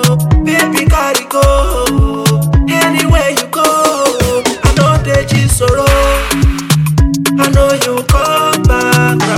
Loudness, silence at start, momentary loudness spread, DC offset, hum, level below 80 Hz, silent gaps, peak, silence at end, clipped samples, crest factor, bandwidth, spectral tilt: -11 LUFS; 0 s; 3 LU; under 0.1%; none; -16 dBFS; none; 0 dBFS; 0 s; under 0.1%; 10 dB; 17.5 kHz; -5 dB/octave